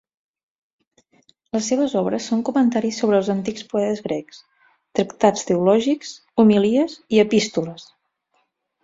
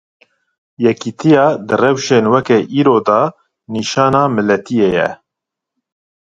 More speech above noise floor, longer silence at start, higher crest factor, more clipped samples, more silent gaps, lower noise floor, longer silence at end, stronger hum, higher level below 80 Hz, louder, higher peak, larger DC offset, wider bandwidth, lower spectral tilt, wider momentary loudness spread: second, 49 dB vs 69 dB; first, 1.55 s vs 0.8 s; about the same, 18 dB vs 14 dB; neither; neither; second, -69 dBFS vs -82 dBFS; second, 1 s vs 1.2 s; neither; second, -62 dBFS vs -54 dBFS; second, -20 LUFS vs -13 LUFS; about the same, -2 dBFS vs 0 dBFS; neither; about the same, 7.8 kHz vs 8 kHz; about the same, -5.5 dB/octave vs -6 dB/octave; first, 10 LU vs 7 LU